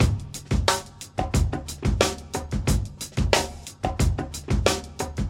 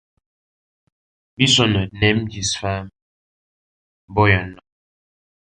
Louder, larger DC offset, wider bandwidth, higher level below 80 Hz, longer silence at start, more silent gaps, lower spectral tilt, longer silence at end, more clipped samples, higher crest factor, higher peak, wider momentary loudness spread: second, -26 LUFS vs -18 LUFS; neither; first, 16.5 kHz vs 10 kHz; first, -30 dBFS vs -42 dBFS; second, 0 s vs 1.4 s; second, none vs 3.02-4.08 s; about the same, -4.5 dB/octave vs -4 dB/octave; second, 0 s vs 0.85 s; neither; about the same, 22 dB vs 20 dB; about the same, -2 dBFS vs -2 dBFS; second, 9 LU vs 12 LU